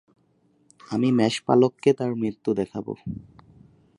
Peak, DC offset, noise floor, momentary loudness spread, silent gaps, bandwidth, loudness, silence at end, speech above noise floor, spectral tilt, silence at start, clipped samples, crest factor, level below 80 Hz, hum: -6 dBFS; under 0.1%; -64 dBFS; 14 LU; none; 11.5 kHz; -24 LUFS; 0.8 s; 41 dB; -6.5 dB/octave; 0.9 s; under 0.1%; 20 dB; -58 dBFS; none